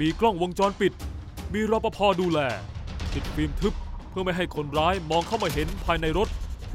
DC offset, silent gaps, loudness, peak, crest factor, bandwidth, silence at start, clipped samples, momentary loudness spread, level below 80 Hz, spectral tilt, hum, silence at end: under 0.1%; none; -26 LUFS; -8 dBFS; 18 dB; 16 kHz; 0 s; under 0.1%; 12 LU; -36 dBFS; -5.5 dB/octave; none; 0 s